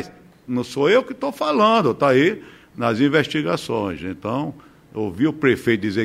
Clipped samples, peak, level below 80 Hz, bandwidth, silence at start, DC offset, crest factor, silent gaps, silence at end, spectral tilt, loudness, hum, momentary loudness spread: under 0.1%; -4 dBFS; -56 dBFS; 15.5 kHz; 0 s; under 0.1%; 16 dB; none; 0 s; -6 dB/octave; -20 LUFS; none; 12 LU